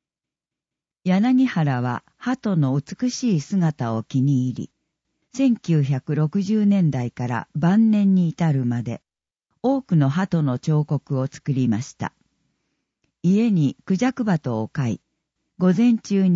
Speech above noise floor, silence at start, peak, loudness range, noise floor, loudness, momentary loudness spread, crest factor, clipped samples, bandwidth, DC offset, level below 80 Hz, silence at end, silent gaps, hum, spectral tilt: 69 dB; 1.05 s; -6 dBFS; 3 LU; -89 dBFS; -21 LUFS; 10 LU; 16 dB; under 0.1%; 7.8 kHz; under 0.1%; -62 dBFS; 0 s; none; none; -7.5 dB/octave